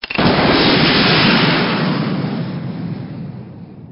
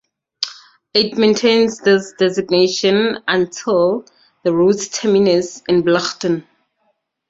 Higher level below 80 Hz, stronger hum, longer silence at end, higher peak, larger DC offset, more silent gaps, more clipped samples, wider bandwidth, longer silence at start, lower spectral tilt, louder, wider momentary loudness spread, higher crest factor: first, -40 dBFS vs -58 dBFS; neither; second, 0 s vs 0.9 s; about the same, 0 dBFS vs -2 dBFS; neither; neither; neither; second, 5.6 kHz vs 8 kHz; second, 0.05 s vs 0.4 s; about the same, -3.5 dB/octave vs -4.5 dB/octave; about the same, -14 LUFS vs -16 LUFS; first, 18 LU vs 9 LU; about the same, 16 dB vs 16 dB